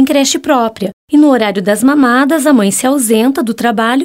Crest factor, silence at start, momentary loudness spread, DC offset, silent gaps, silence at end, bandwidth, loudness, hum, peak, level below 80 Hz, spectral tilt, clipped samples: 10 dB; 0 s; 5 LU; under 0.1%; 0.93-1.08 s; 0 s; 16.5 kHz; -10 LUFS; none; 0 dBFS; -56 dBFS; -4 dB/octave; under 0.1%